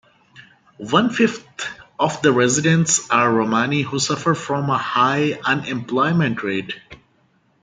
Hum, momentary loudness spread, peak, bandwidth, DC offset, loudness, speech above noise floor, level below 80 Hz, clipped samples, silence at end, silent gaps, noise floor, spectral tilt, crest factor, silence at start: none; 13 LU; 0 dBFS; 9.6 kHz; under 0.1%; -19 LUFS; 42 dB; -60 dBFS; under 0.1%; 0.65 s; none; -60 dBFS; -4 dB/octave; 20 dB; 0.35 s